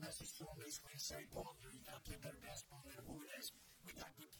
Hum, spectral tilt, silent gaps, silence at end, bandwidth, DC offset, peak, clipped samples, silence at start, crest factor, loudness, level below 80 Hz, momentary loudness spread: none; -2.5 dB/octave; none; 0 s; 19.5 kHz; under 0.1%; -36 dBFS; under 0.1%; 0 s; 18 dB; -53 LUFS; -68 dBFS; 9 LU